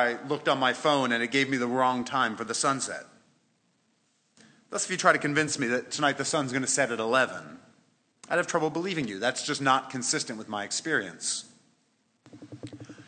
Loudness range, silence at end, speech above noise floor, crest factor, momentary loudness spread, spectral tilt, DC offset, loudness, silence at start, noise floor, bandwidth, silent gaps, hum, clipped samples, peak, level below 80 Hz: 4 LU; 0.05 s; 43 dB; 22 dB; 10 LU; -3 dB/octave; under 0.1%; -27 LUFS; 0 s; -71 dBFS; 10 kHz; none; none; under 0.1%; -6 dBFS; -76 dBFS